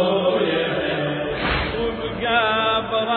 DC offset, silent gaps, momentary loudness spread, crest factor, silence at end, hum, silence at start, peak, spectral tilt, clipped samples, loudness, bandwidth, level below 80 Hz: under 0.1%; none; 6 LU; 14 dB; 0 s; none; 0 s; -6 dBFS; -8 dB/octave; under 0.1%; -21 LUFS; 4.6 kHz; -40 dBFS